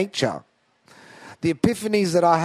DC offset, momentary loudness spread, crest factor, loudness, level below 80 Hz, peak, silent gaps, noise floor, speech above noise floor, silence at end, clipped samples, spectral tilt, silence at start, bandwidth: under 0.1%; 15 LU; 20 dB; -22 LUFS; -54 dBFS; -2 dBFS; none; -55 dBFS; 35 dB; 0 s; under 0.1%; -5.5 dB/octave; 0 s; 15.5 kHz